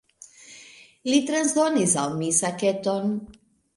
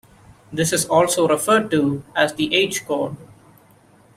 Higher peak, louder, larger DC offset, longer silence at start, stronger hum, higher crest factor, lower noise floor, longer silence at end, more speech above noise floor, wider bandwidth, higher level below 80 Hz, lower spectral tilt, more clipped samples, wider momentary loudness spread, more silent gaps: second, -6 dBFS vs -2 dBFS; second, -23 LUFS vs -19 LUFS; neither; about the same, 0.5 s vs 0.5 s; neither; about the same, 20 dB vs 18 dB; about the same, -49 dBFS vs -52 dBFS; second, 0.45 s vs 0.9 s; second, 26 dB vs 33 dB; second, 11.5 kHz vs 16 kHz; second, -64 dBFS vs -56 dBFS; about the same, -3.5 dB/octave vs -3.5 dB/octave; neither; first, 22 LU vs 8 LU; neither